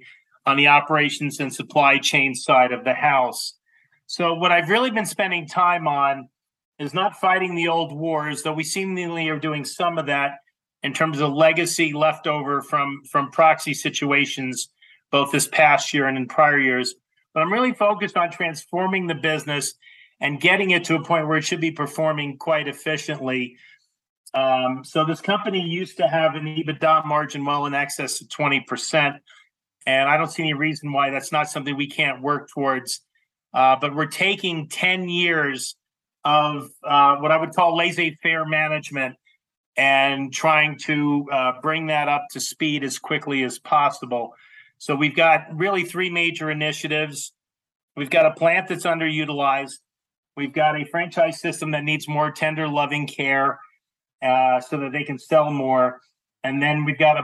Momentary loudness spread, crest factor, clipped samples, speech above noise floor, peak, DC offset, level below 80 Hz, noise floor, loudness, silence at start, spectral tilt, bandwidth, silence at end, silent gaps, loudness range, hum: 10 LU; 20 dB; under 0.1%; 42 dB; -2 dBFS; under 0.1%; -82 dBFS; -63 dBFS; -21 LUFS; 0.45 s; -4 dB/octave; 12.5 kHz; 0 s; 6.65-6.72 s, 24.09-24.24 s, 39.57-39.72 s, 47.75-47.88 s, 50.18-50.23 s, 54.15-54.19 s; 4 LU; none